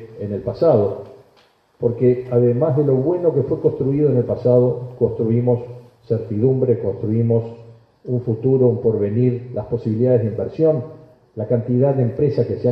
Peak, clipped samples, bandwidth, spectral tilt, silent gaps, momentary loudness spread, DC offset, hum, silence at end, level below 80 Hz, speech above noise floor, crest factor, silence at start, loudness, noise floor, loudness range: -2 dBFS; under 0.1%; 5.4 kHz; -12 dB/octave; none; 9 LU; under 0.1%; none; 0 s; -52 dBFS; 38 dB; 16 dB; 0 s; -19 LUFS; -56 dBFS; 3 LU